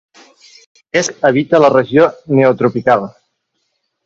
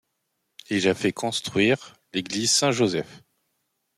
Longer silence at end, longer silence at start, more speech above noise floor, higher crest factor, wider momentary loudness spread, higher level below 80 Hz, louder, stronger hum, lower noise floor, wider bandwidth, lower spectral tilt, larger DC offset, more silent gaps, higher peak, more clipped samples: first, 0.95 s vs 0.8 s; first, 0.95 s vs 0.7 s; first, 57 dB vs 53 dB; about the same, 14 dB vs 18 dB; second, 7 LU vs 11 LU; first, -56 dBFS vs -66 dBFS; first, -13 LUFS vs -23 LUFS; neither; second, -68 dBFS vs -77 dBFS; second, 8 kHz vs 15.5 kHz; first, -5.5 dB/octave vs -3.5 dB/octave; neither; neither; first, 0 dBFS vs -8 dBFS; neither